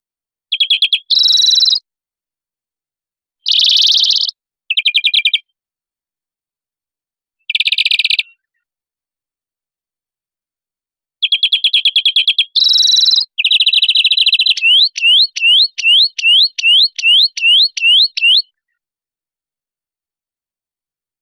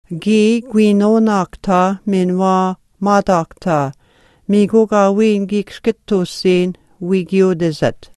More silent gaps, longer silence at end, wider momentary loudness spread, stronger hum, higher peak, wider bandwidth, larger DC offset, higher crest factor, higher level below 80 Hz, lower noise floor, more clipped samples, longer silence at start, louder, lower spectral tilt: neither; first, 2.8 s vs 0.1 s; about the same, 7 LU vs 8 LU; neither; second, -4 dBFS vs 0 dBFS; first, 17.5 kHz vs 12 kHz; neither; about the same, 12 dB vs 14 dB; second, -68 dBFS vs -48 dBFS; first, under -90 dBFS vs -52 dBFS; neither; first, 0.5 s vs 0.1 s; first, -9 LUFS vs -15 LUFS; second, 6 dB/octave vs -7 dB/octave